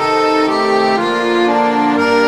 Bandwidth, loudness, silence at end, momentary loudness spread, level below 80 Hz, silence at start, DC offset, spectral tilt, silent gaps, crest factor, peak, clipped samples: 12.5 kHz; -13 LUFS; 0 s; 1 LU; -58 dBFS; 0 s; under 0.1%; -4.5 dB/octave; none; 12 dB; -2 dBFS; under 0.1%